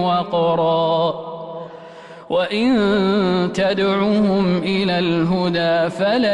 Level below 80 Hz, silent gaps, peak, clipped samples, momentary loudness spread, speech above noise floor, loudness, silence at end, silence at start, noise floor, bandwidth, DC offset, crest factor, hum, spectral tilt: -52 dBFS; none; -8 dBFS; under 0.1%; 14 LU; 21 dB; -18 LUFS; 0 s; 0 s; -38 dBFS; 10.5 kHz; under 0.1%; 10 dB; none; -7 dB/octave